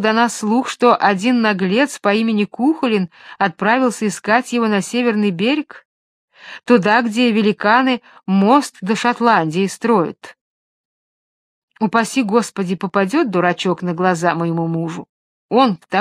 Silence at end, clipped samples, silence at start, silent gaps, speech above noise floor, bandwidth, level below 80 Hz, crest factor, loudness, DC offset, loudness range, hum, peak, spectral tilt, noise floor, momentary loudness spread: 0 s; under 0.1%; 0 s; 5.85-6.28 s, 10.41-11.68 s, 15.09-15.49 s; over 74 dB; 14 kHz; -66 dBFS; 16 dB; -16 LUFS; under 0.1%; 4 LU; none; 0 dBFS; -5.5 dB/octave; under -90 dBFS; 8 LU